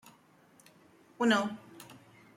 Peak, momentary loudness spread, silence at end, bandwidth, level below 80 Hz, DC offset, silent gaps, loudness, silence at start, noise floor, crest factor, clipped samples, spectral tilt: -12 dBFS; 24 LU; 0.45 s; 16.5 kHz; -82 dBFS; under 0.1%; none; -30 LUFS; 1.2 s; -63 dBFS; 22 dB; under 0.1%; -4 dB/octave